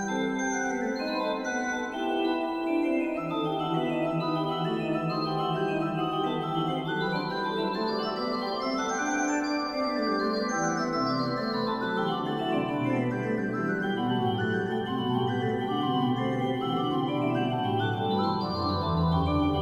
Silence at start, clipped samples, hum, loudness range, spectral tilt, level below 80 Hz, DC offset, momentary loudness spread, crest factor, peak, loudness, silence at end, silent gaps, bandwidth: 0 s; under 0.1%; none; 1 LU; -5.5 dB/octave; -52 dBFS; under 0.1%; 3 LU; 14 dB; -14 dBFS; -28 LUFS; 0 s; none; 13.5 kHz